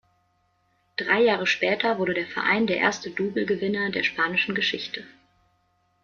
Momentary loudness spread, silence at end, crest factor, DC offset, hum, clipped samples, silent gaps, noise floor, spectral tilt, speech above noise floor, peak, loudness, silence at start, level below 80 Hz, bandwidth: 10 LU; 0.9 s; 20 dB; under 0.1%; none; under 0.1%; none; -68 dBFS; -4.5 dB/octave; 44 dB; -6 dBFS; -24 LUFS; 1 s; -68 dBFS; 7.4 kHz